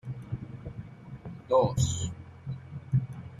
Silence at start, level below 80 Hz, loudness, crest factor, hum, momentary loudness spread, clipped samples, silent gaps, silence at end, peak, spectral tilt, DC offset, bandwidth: 0.05 s; -52 dBFS; -31 LUFS; 18 dB; none; 18 LU; under 0.1%; none; 0 s; -12 dBFS; -6 dB/octave; under 0.1%; 12 kHz